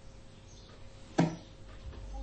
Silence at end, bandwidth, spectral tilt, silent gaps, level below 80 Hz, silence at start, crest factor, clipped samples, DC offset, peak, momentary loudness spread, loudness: 0 s; 8.4 kHz; -6.5 dB/octave; none; -50 dBFS; 0 s; 26 dB; under 0.1%; under 0.1%; -12 dBFS; 22 LU; -35 LUFS